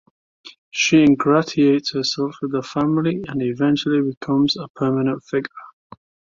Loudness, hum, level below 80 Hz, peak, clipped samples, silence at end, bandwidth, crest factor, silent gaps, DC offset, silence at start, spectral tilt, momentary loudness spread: -19 LUFS; none; -58 dBFS; -4 dBFS; under 0.1%; 0.7 s; 7.6 kHz; 16 dB; 0.58-0.71 s, 4.17-4.21 s, 4.70-4.74 s; under 0.1%; 0.45 s; -5.5 dB/octave; 10 LU